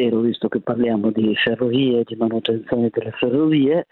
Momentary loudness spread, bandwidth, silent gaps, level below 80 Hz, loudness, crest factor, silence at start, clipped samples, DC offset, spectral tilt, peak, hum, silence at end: 5 LU; 4.3 kHz; none; -60 dBFS; -19 LUFS; 14 dB; 0 s; under 0.1%; under 0.1%; -9.5 dB/octave; -4 dBFS; none; 0.1 s